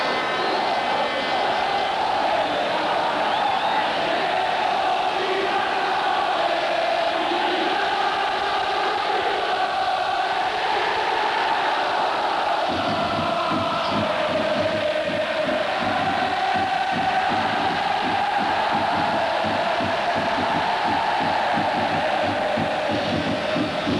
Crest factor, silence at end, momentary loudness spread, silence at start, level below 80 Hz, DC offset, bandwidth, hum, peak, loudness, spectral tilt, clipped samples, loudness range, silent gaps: 10 dB; 0 s; 1 LU; 0 s; -56 dBFS; under 0.1%; 11 kHz; none; -12 dBFS; -22 LUFS; -4 dB/octave; under 0.1%; 1 LU; none